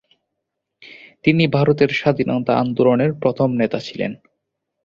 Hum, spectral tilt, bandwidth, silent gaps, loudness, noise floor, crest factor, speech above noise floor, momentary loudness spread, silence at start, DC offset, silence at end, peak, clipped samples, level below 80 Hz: none; -8 dB/octave; 7.4 kHz; none; -18 LUFS; -78 dBFS; 18 dB; 61 dB; 8 LU; 0.8 s; under 0.1%; 0.7 s; -2 dBFS; under 0.1%; -56 dBFS